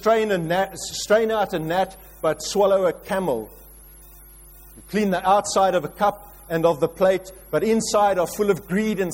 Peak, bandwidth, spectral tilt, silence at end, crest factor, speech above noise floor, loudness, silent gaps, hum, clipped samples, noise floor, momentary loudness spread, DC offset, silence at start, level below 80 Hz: -6 dBFS; 16.5 kHz; -4.5 dB/octave; 0 s; 16 dB; 24 dB; -22 LUFS; none; none; under 0.1%; -45 dBFS; 8 LU; under 0.1%; 0 s; -50 dBFS